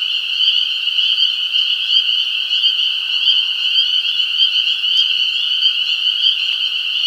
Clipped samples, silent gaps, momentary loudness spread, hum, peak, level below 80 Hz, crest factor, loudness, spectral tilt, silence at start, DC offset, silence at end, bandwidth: under 0.1%; none; 3 LU; none; -2 dBFS; -76 dBFS; 16 dB; -13 LUFS; 4 dB/octave; 0 s; under 0.1%; 0 s; 16.5 kHz